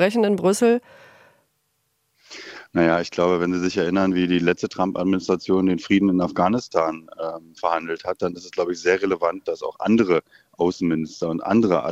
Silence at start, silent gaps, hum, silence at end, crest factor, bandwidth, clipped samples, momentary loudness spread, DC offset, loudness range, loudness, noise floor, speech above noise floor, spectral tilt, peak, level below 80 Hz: 0 s; none; none; 0 s; 20 dB; 14.5 kHz; under 0.1%; 9 LU; under 0.1%; 3 LU; -22 LUFS; -70 dBFS; 50 dB; -6 dB/octave; -2 dBFS; -60 dBFS